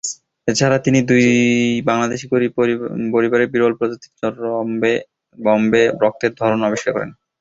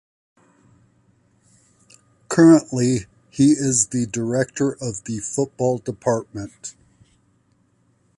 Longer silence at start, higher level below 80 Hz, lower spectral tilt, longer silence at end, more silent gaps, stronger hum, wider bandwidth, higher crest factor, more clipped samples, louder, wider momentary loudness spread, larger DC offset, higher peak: second, 0.05 s vs 2.3 s; about the same, -56 dBFS vs -56 dBFS; about the same, -5 dB/octave vs -5.5 dB/octave; second, 0.3 s vs 1.45 s; neither; neither; second, 8 kHz vs 11.5 kHz; about the same, 16 dB vs 18 dB; neither; about the same, -17 LUFS vs -19 LUFS; second, 10 LU vs 20 LU; neither; about the same, -2 dBFS vs -4 dBFS